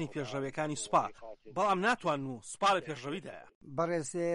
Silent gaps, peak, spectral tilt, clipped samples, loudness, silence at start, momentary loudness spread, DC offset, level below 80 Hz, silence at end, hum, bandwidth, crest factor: 3.55-3.61 s; -16 dBFS; -4.5 dB/octave; under 0.1%; -33 LUFS; 0 s; 12 LU; under 0.1%; -68 dBFS; 0 s; none; 11.5 kHz; 18 dB